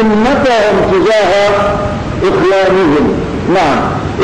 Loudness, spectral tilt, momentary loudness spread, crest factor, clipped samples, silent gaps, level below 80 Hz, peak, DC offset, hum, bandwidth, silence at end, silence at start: -10 LUFS; -6 dB/octave; 6 LU; 6 dB; under 0.1%; none; -28 dBFS; -4 dBFS; under 0.1%; none; 11 kHz; 0 s; 0 s